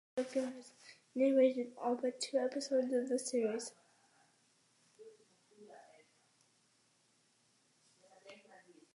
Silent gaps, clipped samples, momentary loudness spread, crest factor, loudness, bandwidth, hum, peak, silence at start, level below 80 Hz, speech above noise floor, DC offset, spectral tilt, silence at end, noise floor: none; under 0.1%; 26 LU; 20 dB; -36 LUFS; 11.5 kHz; none; -20 dBFS; 0.15 s; under -90 dBFS; 39 dB; under 0.1%; -3.5 dB/octave; 0.6 s; -74 dBFS